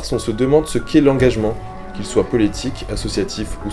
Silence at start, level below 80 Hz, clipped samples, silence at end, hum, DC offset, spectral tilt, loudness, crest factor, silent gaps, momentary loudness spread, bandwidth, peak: 0 s; -32 dBFS; under 0.1%; 0 s; none; under 0.1%; -6 dB/octave; -18 LUFS; 18 dB; none; 11 LU; 12 kHz; 0 dBFS